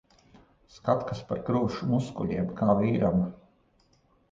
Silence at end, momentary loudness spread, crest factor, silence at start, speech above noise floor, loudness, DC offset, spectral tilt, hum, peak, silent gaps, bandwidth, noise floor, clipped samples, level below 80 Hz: 0.95 s; 9 LU; 18 dB; 0.75 s; 39 dB; -28 LUFS; under 0.1%; -8.5 dB/octave; none; -10 dBFS; none; 7.6 kHz; -66 dBFS; under 0.1%; -54 dBFS